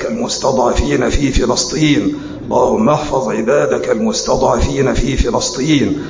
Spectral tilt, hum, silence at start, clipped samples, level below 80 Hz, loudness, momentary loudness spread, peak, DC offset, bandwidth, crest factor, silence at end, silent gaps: -5 dB/octave; none; 0 s; under 0.1%; -24 dBFS; -14 LUFS; 3 LU; 0 dBFS; under 0.1%; 7.6 kHz; 12 dB; 0 s; none